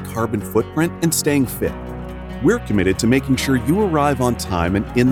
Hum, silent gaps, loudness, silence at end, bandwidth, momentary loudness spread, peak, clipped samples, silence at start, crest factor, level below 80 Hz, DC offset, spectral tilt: none; none; -18 LUFS; 0 s; 19 kHz; 8 LU; -2 dBFS; under 0.1%; 0 s; 16 dB; -34 dBFS; under 0.1%; -5.5 dB/octave